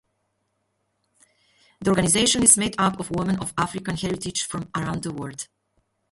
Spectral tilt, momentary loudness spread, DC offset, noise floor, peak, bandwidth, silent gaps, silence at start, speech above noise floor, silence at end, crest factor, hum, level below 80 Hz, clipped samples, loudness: -3 dB/octave; 16 LU; under 0.1%; -74 dBFS; 0 dBFS; 12 kHz; none; 1.8 s; 51 dB; 0.65 s; 24 dB; none; -50 dBFS; under 0.1%; -22 LUFS